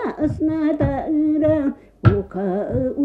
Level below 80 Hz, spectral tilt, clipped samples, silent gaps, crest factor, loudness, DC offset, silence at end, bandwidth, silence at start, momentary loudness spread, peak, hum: -38 dBFS; -10.5 dB/octave; under 0.1%; none; 18 dB; -20 LUFS; under 0.1%; 0 s; 4.8 kHz; 0 s; 5 LU; 0 dBFS; none